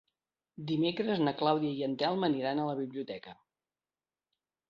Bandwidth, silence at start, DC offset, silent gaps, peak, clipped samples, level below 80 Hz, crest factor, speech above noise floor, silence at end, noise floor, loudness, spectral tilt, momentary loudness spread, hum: 6.4 kHz; 0.6 s; under 0.1%; none; -14 dBFS; under 0.1%; -76 dBFS; 20 dB; over 58 dB; 1.35 s; under -90 dBFS; -32 LUFS; -8 dB/octave; 13 LU; none